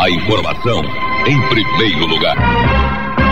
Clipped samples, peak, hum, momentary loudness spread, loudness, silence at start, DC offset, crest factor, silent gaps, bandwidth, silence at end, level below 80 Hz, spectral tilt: under 0.1%; 0 dBFS; none; 4 LU; -14 LUFS; 0 s; 9%; 14 dB; none; 15 kHz; 0 s; -24 dBFS; -6 dB/octave